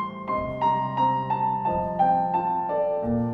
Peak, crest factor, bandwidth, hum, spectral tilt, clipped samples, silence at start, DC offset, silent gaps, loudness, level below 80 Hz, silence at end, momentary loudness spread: -12 dBFS; 14 dB; 6.2 kHz; none; -9 dB/octave; under 0.1%; 0 s; under 0.1%; none; -25 LUFS; -48 dBFS; 0 s; 4 LU